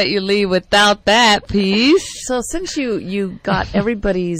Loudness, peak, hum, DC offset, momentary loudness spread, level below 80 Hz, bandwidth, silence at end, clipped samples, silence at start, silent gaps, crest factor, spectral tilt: -15 LUFS; -4 dBFS; none; under 0.1%; 10 LU; -36 dBFS; 16 kHz; 0 s; under 0.1%; 0 s; none; 12 dB; -4 dB/octave